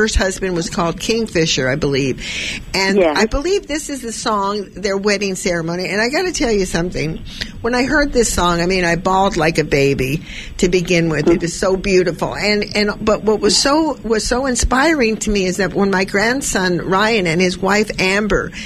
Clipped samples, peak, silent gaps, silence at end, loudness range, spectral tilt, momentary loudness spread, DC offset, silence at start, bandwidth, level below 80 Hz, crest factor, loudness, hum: under 0.1%; -2 dBFS; none; 0 s; 3 LU; -4 dB/octave; 7 LU; under 0.1%; 0 s; 14.5 kHz; -32 dBFS; 14 dB; -16 LUFS; none